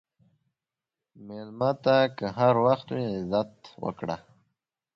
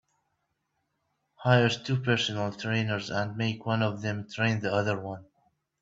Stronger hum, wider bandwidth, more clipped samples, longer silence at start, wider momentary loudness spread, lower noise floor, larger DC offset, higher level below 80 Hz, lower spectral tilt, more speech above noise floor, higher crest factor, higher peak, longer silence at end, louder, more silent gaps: neither; second, 6.8 kHz vs 7.8 kHz; neither; second, 1.2 s vs 1.4 s; first, 16 LU vs 10 LU; first, -89 dBFS vs -79 dBFS; neither; about the same, -64 dBFS vs -64 dBFS; first, -7.5 dB/octave vs -6 dB/octave; first, 63 dB vs 51 dB; about the same, 20 dB vs 22 dB; about the same, -8 dBFS vs -8 dBFS; first, 0.75 s vs 0.6 s; about the same, -26 LUFS vs -28 LUFS; neither